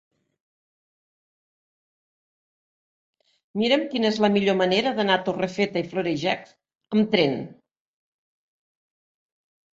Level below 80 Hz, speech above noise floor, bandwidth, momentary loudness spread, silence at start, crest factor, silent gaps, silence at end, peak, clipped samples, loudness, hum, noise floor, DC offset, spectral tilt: -68 dBFS; over 67 dB; 7.8 kHz; 7 LU; 3.55 s; 22 dB; none; 2.2 s; -4 dBFS; under 0.1%; -23 LUFS; none; under -90 dBFS; under 0.1%; -5.5 dB/octave